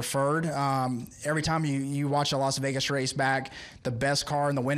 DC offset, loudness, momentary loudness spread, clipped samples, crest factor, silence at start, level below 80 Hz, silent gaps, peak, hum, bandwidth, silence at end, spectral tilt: under 0.1%; -28 LUFS; 5 LU; under 0.1%; 14 dB; 0 s; -56 dBFS; none; -14 dBFS; none; 14.5 kHz; 0 s; -4.5 dB/octave